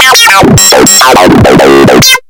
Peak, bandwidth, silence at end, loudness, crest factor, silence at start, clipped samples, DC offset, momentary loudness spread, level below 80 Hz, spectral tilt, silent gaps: 0 dBFS; over 20 kHz; 0.1 s; -1 LUFS; 2 dB; 0 s; 30%; under 0.1%; 2 LU; -24 dBFS; -3 dB/octave; none